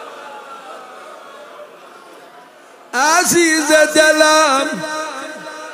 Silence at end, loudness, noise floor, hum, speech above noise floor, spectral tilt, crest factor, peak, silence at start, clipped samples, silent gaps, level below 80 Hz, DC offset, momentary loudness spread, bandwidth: 0 s; -13 LUFS; -42 dBFS; none; 30 dB; -1.5 dB/octave; 16 dB; 0 dBFS; 0 s; under 0.1%; none; -64 dBFS; under 0.1%; 25 LU; 15.5 kHz